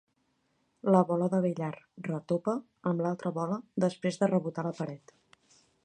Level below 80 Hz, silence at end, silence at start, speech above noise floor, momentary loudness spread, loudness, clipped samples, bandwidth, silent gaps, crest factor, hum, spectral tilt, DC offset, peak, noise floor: -76 dBFS; 0.9 s; 0.85 s; 45 dB; 12 LU; -31 LUFS; under 0.1%; 9.6 kHz; none; 22 dB; none; -8 dB/octave; under 0.1%; -10 dBFS; -75 dBFS